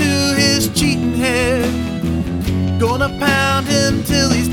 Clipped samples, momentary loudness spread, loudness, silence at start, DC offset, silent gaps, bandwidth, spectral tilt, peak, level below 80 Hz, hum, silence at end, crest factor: under 0.1%; 6 LU; -16 LUFS; 0 s; under 0.1%; none; 19 kHz; -4.5 dB/octave; 0 dBFS; -32 dBFS; none; 0 s; 14 dB